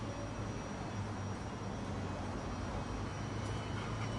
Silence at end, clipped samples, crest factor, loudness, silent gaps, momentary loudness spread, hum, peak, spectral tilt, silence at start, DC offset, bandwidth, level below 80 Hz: 0 s; under 0.1%; 12 dB; -41 LUFS; none; 2 LU; none; -28 dBFS; -6 dB/octave; 0 s; under 0.1%; 11.5 kHz; -50 dBFS